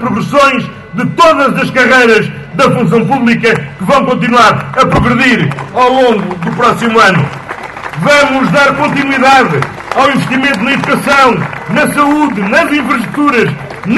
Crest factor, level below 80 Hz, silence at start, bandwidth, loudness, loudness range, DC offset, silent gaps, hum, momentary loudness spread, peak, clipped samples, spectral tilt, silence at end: 10 dB; -38 dBFS; 0 s; 12.5 kHz; -9 LUFS; 1 LU; under 0.1%; none; none; 9 LU; 0 dBFS; 0.9%; -5.5 dB/octave; 0 s